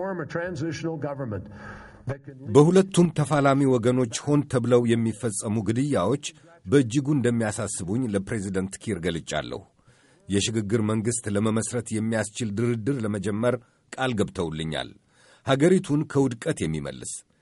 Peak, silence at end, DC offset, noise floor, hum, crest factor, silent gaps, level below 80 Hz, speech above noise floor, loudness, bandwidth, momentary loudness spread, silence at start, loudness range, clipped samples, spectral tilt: -4 dBFS; 0.2 s; under 0.1%; -58 dBFS; none; 20 dB; none; -54 dBFS; 34 dB; -25 LUFS; 11.5 kHz; 15 LU; 0 s; 6 LU; under 0.1%; -6 dB/octave